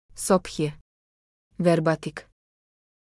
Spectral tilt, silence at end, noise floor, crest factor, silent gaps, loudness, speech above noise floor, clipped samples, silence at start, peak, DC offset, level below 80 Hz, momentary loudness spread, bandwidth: -5.5 dB/octave; 0.8 s; under -90 dBFS; 20 dB; 0.81-1.51 s; -25 LUFS; over 66 dB; under 0.1%; 0.15 s; -6 dBFS; under 0.1%; -56 dBFS; 12 LU; 12 kHz